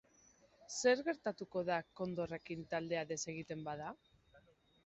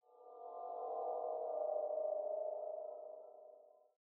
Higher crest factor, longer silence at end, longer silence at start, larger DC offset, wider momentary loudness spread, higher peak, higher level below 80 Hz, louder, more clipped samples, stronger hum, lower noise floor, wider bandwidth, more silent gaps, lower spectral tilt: first, 22 dB vs 14 dB; about the same, 0.45 s vs 0.35 s; first, 0.6 s vs 0.1 s; neither; second, 12 LU vs 17 LU; first, -20 dBFS vs -30 dBFS; first, -74 dBFS vs under -90 dBFS; first, -40 LUFS vs -43 LUFS; neither; neither; first, -69 dBFS vs -64 dBFS; first, 8 kHz vs 1.5 kHz; neither; about the same, -4 dB/octave vs -4 dB/octave